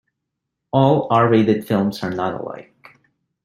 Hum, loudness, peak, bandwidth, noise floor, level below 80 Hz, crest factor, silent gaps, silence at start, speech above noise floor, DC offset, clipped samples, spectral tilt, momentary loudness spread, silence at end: none; -18 LUFS; -2 dBFS; 15.5 kHz; -79 dBFS; -58 dBFS; 18 dB; none; 0.75 s; 62 dB; under 0.1%; under 0.1%; -8 dB/octave; 14 LU; 0.8 s